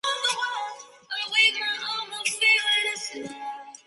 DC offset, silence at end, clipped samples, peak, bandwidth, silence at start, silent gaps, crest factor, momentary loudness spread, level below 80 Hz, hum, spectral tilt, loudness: under 0.1%; 0.15 s; under 0.1%; -8 dBFS; 12 kHz; 0.05 s; none; 18 dB; 17 LU; -82 dBFS; none; 1.5 dB/octave; -23 LUFS